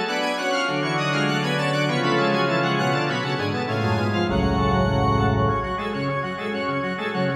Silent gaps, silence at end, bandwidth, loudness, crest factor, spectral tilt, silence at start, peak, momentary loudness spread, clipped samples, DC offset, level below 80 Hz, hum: none; 0 s; 13 kHz; -22 LUFS; 14 dB; -6 dB/octave; 0 s; -8 dBFS; 5 LU; under 0.1%; under 0.1%; -38 dBFS; none